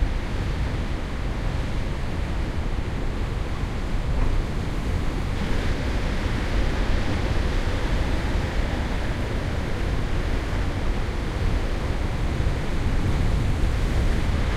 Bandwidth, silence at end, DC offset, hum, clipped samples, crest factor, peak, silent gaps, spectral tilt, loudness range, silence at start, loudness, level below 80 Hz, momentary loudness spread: 12.5 kHz; 0 s; under 0.1%; none; under 0.1%; 14 dB; -10 dBFS; none; -6.5 dB/octave; 3 LU; 0 s; -27 LUFS; -26 dBFS; 4 LU